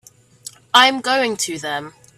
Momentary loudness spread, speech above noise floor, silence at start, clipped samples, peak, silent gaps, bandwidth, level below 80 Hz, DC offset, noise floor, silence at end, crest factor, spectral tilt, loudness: 25 LU; 23 dB; 0.75 s; under 0.1%; 0 dBFS; none; 16 kHz; -64 dBFS; under 0.1%; -41 dBFS; 0.3 s; 20 dB; -1 dB/octave; -16 LUFS